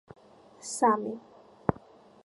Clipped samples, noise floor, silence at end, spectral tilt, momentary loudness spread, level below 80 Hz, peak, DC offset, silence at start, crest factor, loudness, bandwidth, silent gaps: under 0.1%; -54 dBFS; 0.5 s; -5 dB/octave; 19 LU; -58 dBFS; -6 dBFS; under 0.1%; 0.65 s; 26 dB; -30 LUFS; 11.5 kHz; none